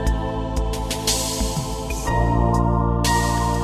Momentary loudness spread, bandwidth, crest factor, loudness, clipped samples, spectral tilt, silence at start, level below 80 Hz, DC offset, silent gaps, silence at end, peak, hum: 6 LU; 14 kHz; 14 dB; -21 LUFS; under 0.1%; -4.5 dB/octave; 0 s; -26 dBFS; under 0.1%; none; 0 s; -6 dBFS; none